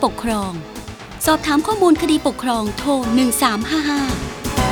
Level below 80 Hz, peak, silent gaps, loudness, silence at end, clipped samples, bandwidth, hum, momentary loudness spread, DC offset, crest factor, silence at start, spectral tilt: -36 dBFS; 0 dBFS; none; -18 LUFS; 0 s; under 0.1%; over 20 kHz; none; 11 LU; under 0.1%; 18 dB; 0 s; -4 dB/octave